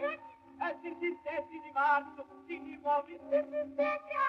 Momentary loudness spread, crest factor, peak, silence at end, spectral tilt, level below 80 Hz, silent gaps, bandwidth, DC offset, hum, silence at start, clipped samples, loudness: 15 LU; 16 dB; -18 dBFS; 0 s; -5.5 dB/octave; -76 dBFS; none; 6 kHz; under 0.1%; none; 0 s; under 0.1%; -35 LUFS